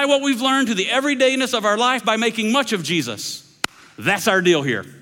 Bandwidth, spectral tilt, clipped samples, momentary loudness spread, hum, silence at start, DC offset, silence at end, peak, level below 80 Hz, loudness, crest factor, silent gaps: 17 kHz; -3.5 dB/octave; under 0.1%; 11 LU; none; 0 s; under 0.1%; 0.05 s; 0 dBFS; -64 dBFS; -19 LUFS; 18 dB; none